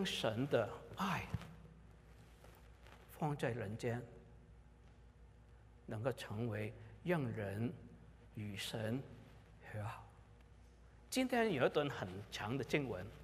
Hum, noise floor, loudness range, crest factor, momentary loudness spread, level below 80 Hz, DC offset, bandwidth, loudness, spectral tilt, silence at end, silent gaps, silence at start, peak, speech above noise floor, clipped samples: none; -62 dBFS; 6 LU; 22 dB; 25 LU; -64 dBFS; under 0.1%; 15.5 kHz; -41 LUFS; -5.5 dB/octave; 0 s; none; 0 s; -20 dBFS; 22 dB; under 0.1%